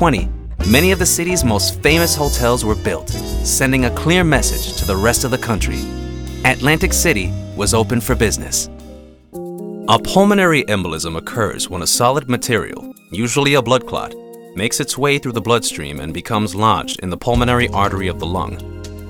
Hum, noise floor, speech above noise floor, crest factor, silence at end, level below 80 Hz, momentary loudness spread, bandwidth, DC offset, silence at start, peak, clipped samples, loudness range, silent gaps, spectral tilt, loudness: none; -38 dBFS; 22 dB; 16 dB; 0 s; -28 dBFS; 13 LU; over 20 kHz; under 0.1%; 0 s; 0 dBFS; under 0.1%; 3 LU; none; -4 dB/octave; -16 LUFS